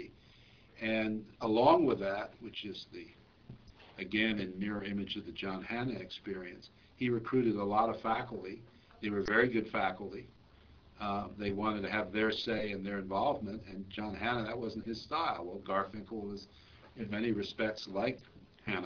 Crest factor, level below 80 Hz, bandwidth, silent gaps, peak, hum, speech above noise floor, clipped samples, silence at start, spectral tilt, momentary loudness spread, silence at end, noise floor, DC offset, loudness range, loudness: 24 dB; -62 dBFS; 5.4 kHz; none; -12 dBFS; none; 26 dB; under 0.1%; 0 s; -3.5 dB/octave; 15 LU; 0 s; -61 dBFS; under 0.1%; 5 LU; -35 LUFS